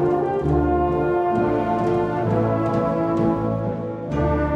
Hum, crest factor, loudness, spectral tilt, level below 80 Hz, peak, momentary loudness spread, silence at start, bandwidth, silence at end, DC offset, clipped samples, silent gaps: none; 12 dB; -21 LUFS; -9.5 dB/octave; -34 dBFS; -8 dBFS; 4 LU; 0 s; 7.2 kHz; 0 s; under 0.1%; under 0.1%; none